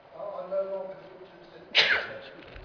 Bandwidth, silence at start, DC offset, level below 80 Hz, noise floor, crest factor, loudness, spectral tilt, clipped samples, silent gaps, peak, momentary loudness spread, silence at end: 5.4 kHz; 0.1 s; under 0.1%; -64 dBFS; -49 dBFS; 24 dB; -26 LUFS; -2 dB/octave; under 0.1%; none; -8 dBFS; 24 LU; 0 s